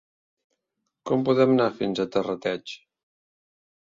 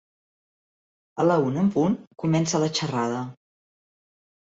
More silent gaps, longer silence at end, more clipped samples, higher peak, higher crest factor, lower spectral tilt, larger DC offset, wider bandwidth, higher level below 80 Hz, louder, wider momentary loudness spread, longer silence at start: second, none vs 2.07-2.11 s; about the same, 1.1 s vs 1.15 s; neither; first, -6 dBFS vs -10 dBFS; about the same, 20 dB vs 16 dB; first, -7 dB/octave vs -5.5 dB/octave; neither; about the same, 7.6 kHz vs 8 kHz; about the same, -66 dBFS vs -64 dBFS; about the same, -24 LUFS vs -24 LUFS; first, 20 LU vs 9 LU; about the same, 1.05 s vs 1.15 s